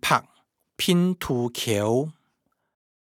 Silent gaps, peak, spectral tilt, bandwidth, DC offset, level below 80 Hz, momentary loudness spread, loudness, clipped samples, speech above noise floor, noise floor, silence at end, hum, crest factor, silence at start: none; -4 dBFS; -5 dB/octave; 18 kHz; under 0.1%; -58 dBFS; 5 LU; -24 LUFS; under 0.1%; 50 dB; -74 dBFS; 1 s; none; 22 dB; 0.05 s